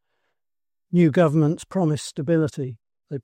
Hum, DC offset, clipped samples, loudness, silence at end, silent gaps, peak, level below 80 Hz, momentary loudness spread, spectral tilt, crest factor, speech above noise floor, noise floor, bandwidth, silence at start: none; under 0.1%; under 0.1%; -21 LUFS; 0.05 s; none; -6 dBFS; -62 dBFS; 14 LU; -7.5 dB/octave; 16 dB; over 70 dB; under -90 dBFS; 10.5 kHz; 0.9 s